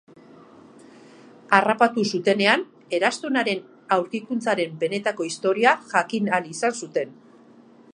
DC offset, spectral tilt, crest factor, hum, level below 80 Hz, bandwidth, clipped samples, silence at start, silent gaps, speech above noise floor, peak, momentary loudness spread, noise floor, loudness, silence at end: under 0.1%; -4 dB/octave; 24 dB; none; -78 dBFS; 10.5 kHz; under 0.1%; 1.5 s; none; 28 dB; 0 dBFS; 9 LU; -51 dBFS; -22 LUFS; 0.8 s